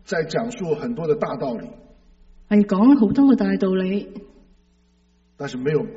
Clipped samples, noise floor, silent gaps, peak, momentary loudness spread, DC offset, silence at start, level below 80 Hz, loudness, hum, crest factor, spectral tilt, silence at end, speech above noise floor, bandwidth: under 0.1%; -60 dBFS; none; -4 dBFS; 18 LU; under 0.1%; 0.1 s; -52 dBFS; -20 LUFS; none; 16 dB; -7 dB/octave; 0 s; 40 dB; 8 kHz